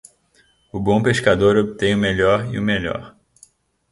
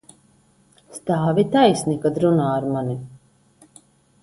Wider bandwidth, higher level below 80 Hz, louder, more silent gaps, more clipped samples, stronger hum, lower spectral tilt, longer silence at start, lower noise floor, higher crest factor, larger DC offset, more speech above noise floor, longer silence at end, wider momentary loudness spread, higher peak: about the same, 11.5 kHz vs 11.5 kHz; first, -44 dBFS vs -58 dBFS; about the same, -18 LUFS vs -20 LUFS; neither; neither; neither; about the same, -6 dB/octave vs -6.5 dB/octave; second, 0.75 s vs 0.9 s; about the same, -59 dBFS vs -58 dBFS; about the same, 20 dB vs 20 dB; neither; about the same, 41 dB vs 38 dB; second, 0.85 s vs 1.05 s; second, 11 LU vs 15 LU; about the same, 0 dBFS vs -2 dBFS